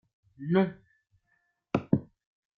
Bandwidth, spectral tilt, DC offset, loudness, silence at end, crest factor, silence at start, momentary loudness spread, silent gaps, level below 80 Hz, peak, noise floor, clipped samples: 6.4 kHz; -9.5 dB/octave; under 0.1%; -30 LUFS; 0.55 s; 24 dB; 0.4 s; 7 LU; none; -66 dBFS; -8 dBFS; -75 dBFS; under 0.1%